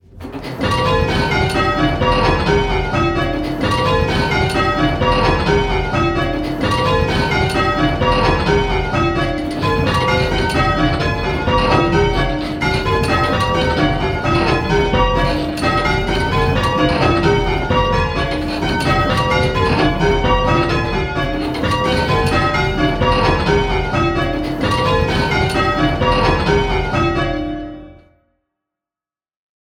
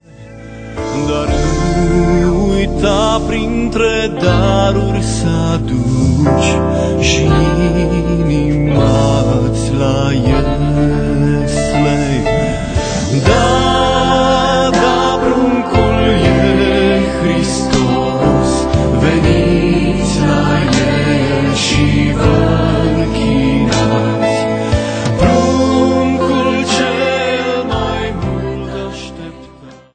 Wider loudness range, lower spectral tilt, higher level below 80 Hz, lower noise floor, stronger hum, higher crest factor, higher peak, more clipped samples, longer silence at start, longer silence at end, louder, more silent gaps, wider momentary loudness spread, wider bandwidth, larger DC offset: about the same, 1 LU vs 2 LU; about the same, -6 dB/octave vs -6 dB/octave; about the same, -26 dBFS vs -24 dBFS; first, under -90 dBFS vs -37 dBFS; neither; about the same, 16 dB vs 12 dB; about the same, 0 dBFS vs 0 dBFS; neither; about the same, 0.15 s vs 0.2 s; first, 1.75 s vs 0.2 s; second, -16 LUFS vs -13 LUFS; neither; about the same, 5 LU vs 5 LU; first, 15 kHz vs 9.4 kHz; neither